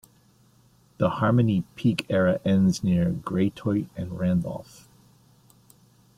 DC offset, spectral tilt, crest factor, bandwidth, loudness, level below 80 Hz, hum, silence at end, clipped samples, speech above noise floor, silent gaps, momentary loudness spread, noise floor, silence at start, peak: under 0.1%; -7.5 dB/octave; 18 dB; 12.5 kHz; -25 LUFS; -56 dBFS; none; 1.55 s; under 0.1%; 36 dB; none; 7 LU; -59 dBFS; 1 s; -8 dBFS